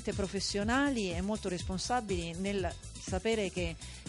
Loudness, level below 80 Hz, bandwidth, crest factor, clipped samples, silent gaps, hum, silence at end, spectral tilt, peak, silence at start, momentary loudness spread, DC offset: -34 LUFS; -46 dBFS; 11.5 kHz; 14 dB; under 0.1%; none; none; 0 s; -4.5 dB/octave; -20 dBFS; 0 s; 8 LU; under 0.1%